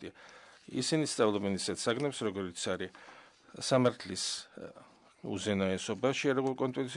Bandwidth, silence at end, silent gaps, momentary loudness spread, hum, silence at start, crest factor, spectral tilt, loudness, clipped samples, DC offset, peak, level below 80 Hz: 11 kHz; 0 s; none; 20 LU; none; 0 s; 18 dB; -4.5 dB/octave; -33 LUFS; under 0.1%; under 0.1%; -16 dBFS; -76 dBFS